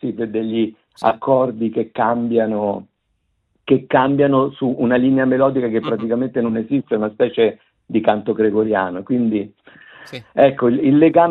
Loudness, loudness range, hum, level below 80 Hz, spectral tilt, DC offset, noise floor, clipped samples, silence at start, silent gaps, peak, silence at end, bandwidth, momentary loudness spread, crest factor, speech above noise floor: -18 LUFS; 3 LU; none; -60 dBFS; -9 dB/octave; under 0.1%; -68 dBFS; under 0.1%; 0.05 s; none; -2 dBFS; 0 s; 5.4 kHz; 8 LU; 16 dB; 51 dB